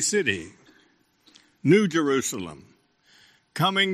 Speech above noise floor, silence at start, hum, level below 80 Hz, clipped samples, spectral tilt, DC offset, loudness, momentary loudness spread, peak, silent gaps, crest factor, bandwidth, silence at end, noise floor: 40 dB; 0 s; none; -66 dBFS; under 0.1%; -4 dB/octave; under 0.1%; -23 LUFS; 19 LU; -6 dBFS; none; 20 dB; 15 kHz; 0 s; -63 dBFS